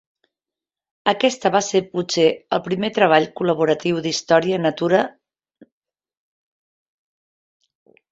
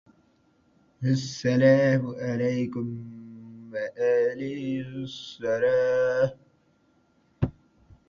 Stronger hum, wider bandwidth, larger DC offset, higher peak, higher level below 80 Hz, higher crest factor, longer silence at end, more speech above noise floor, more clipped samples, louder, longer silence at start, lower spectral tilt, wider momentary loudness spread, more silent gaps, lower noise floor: neither; about the same, 8 kHz vs 7.4 kHz; neither; first, -2 dBFS vs -8 dBFS; second, -64 dBFS vs -54 dBFS; about the same, 20 dB vs 18 dB; first, 3 s vs 0.55 s; first, 71 dB vs 40 dB; neither; first, -19 LUFS vs -26 LUFS; about the same, 1.05 s vs 1 s; second, -4.5 dB/octave vs -7 dB/octave; second, 7 LU vs 16 LU; neither; first, -89 dBFS vs -65 dBFS